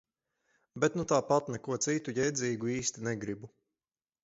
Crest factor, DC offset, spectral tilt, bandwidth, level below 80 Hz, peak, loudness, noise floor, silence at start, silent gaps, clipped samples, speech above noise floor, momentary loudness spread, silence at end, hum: 22 dB; under 0.1%; -4.5 dB/octave; 8.2 kHz; -66 dBFS; -12 dBFS; -32 LUFS; under -90 dBFS; 0.75 s; none; under 0.1%; over 58 dB; 10 LU; 0.75 s; none